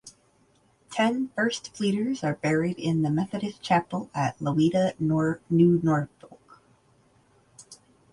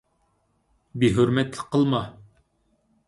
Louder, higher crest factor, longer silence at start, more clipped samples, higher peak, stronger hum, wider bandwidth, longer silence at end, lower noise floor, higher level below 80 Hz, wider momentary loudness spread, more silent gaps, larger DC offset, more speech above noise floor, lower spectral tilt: second, -26 LUFS vs -23 LUFS; about the same, 18 dB vs 18 dB; second, 0.05 s vs 0.95 s; neither; second, -10 dBFS vs -6 dBFS; neither; about the same, 11.5 kHz vs 11.5 kHz; second, 0.4 s vs 0.95 s; second, -64 dBFS vs -69 dBFS; second, -60 dBFS vs -54 dBFS; second, 8 LU vs 15 LU; neither; neither; second, 39 dB vs 47 dB; about the same, -6.5 dB/octave vs -7 dB/octave